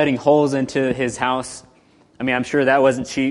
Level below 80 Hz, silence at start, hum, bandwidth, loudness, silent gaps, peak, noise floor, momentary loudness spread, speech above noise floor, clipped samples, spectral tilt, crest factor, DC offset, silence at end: -52 dBFS; 0 s; none; 11.5 kHz; -19 LUFS; none; -2 dBFS; -54 dBFS; 10 LU; 36 dB; under 0.1%; -5 dB/octave; 16 dB; under 0.1%; 0 s